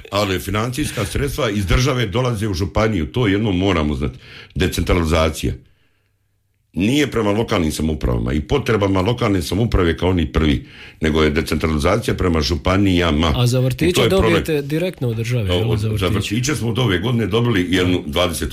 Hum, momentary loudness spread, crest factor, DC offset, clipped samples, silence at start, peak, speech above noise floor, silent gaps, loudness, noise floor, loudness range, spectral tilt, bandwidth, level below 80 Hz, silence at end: none; 6 LU; 12 dB; under 0.1%; under 0.1%; 0 s; -6 dBFS; 47 dB; none; -18 LUFS; -64 dBFS; 4 LU; -5.5 dB/octave; 16 kHz; -30 dBFS; 0 s